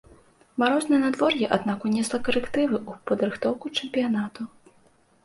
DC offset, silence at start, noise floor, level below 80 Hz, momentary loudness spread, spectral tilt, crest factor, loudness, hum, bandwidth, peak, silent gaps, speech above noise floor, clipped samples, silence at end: under 0.1%; 0.55 s; -60 dBFS; -58 dBFS; 8 LU; -4.5 dB/octave; 20 dB; -25 LUFS; none; 11.5 kHz; -6 dBFS; none; 36 dB; under 0.1%; 0.75 s